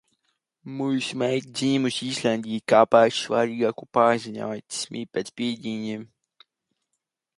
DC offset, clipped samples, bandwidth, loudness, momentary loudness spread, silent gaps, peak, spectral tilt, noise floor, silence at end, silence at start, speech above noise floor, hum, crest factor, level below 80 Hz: under 0.1%; under 0.1%; 11.5 kHz; -24 LUFS; 13 LU; none; -4 dBFS; -4.5 dB/octave; -81 dBFS; 1.3 s; 0.65 s; 57 dB; none; 22 dB; -70 dBFS